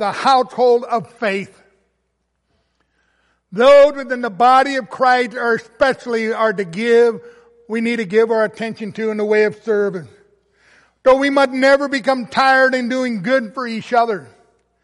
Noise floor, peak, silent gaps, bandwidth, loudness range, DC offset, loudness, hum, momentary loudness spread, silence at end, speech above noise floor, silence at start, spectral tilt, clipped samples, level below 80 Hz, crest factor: -70 dBFS; -2 dBFS; none; 11.5 kHz; 4 LU; under 0.1%; -16 LUFS; none; 11 LU; 0.6 s; 54 dB; 0 s; -5 dB/octave; under 0.1%; -56 dBFS; 14 dB